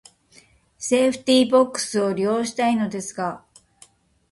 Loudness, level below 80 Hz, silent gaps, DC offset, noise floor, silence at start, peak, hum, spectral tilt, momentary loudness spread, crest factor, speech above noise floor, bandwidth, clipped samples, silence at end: -21 LUFS; -64 dBFS; none; under 0.1%; -55 dBFS; 0.8 s; -6 dBFS; none; -4 dB/octave; 12 LU; 18 dB; 34 dB; 11.5 kHz; under 0.1%; 0.95 s